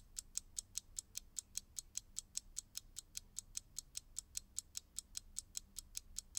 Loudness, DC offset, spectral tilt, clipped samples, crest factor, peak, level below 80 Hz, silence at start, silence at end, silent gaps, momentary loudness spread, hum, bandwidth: -48 LUFS; under 0.1%; 1 dB/octave; under 0.1%; 30 dB; -20 dBFS; -64 dBFS; 0 s; 0 s; none; 3 LU; none; 18 kHz